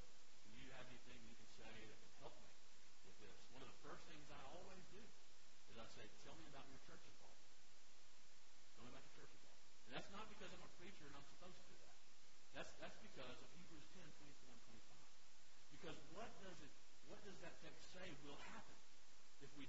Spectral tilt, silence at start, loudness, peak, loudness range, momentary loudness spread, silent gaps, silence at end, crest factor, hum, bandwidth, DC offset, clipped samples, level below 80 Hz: -3 dB/octave; 0 s; -63 LUFS; -38 dBFS; 4 LU; 10 LU; none; 0 s; 22 dB; none; 7.6 kHz; 0.4%; under 0.1%; -76 dBFS